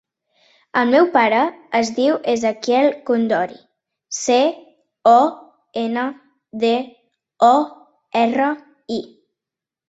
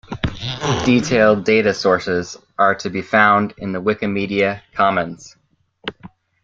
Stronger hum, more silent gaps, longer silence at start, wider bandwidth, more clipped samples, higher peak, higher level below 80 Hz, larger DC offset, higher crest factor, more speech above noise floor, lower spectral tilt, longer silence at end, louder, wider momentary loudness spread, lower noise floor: neither; neither; first, 0.75 s vs 0.1 s; about the same, 8 kHz vs 7.8 kHz; neither; about the same, -2 dBFS vs -2 dBFS; second, -66 dBFS vs -44 dBFS; neither; about the same, 18 dB vs 16 dB; first, 70 dB vs 27 dB; second, -3.5 dB/octave vs -5.5 dB/octave; first, 0.85 s vs 0.35 s; about the same, -18 LUFS vs -17 LUFS; about the same, 14 LU vs 16 LU; first, -87 dBFS vs -44 dBFS